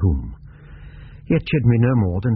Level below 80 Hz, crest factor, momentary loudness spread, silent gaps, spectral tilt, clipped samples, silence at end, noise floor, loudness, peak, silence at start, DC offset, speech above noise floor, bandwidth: -32 dBFS; 16 dB; 23 LU; none; -8 dB/octave; under 0.1%; 0 s; -40 dBFS; -19 LUFS; -4 dBFS; 0 s; under 0.1%; 23 dB; 4.7 kHz